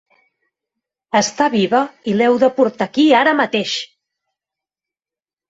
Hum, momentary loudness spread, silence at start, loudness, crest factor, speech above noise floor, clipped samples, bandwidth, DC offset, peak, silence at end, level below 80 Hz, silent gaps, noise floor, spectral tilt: none; 8 LU; 1.15 s; -16 LUFS; 16 dB; over 75 dB; under 0.1%; 8 kHz; under 0.1%; -2 dBFS; 1.65 s; -64 dBFS; none; under -90 dBFS; -4 dB/octave